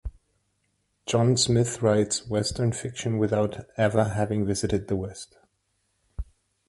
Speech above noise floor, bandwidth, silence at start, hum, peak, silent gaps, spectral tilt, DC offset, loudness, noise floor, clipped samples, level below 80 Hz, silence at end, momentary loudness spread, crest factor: 49 dB; 11.5 kHz; 0.05 s; none; -6 dBFS; none; -5 dB/octave; under 0.1%; -25 LUFS; -73 dBFS; under 0.1%; -46 dBFS; 0.45 s; 19 LU; 20 dB